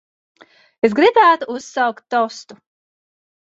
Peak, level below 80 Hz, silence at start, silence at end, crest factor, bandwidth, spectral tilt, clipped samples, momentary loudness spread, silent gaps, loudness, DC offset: 0 dBFS; -64 dBFS; 0.85 s; 1.2 s; 18 dB; 8 kHz; -4 dB/octave; under 0.1%; 13 LU; none; -16 LUFS; under 0.1%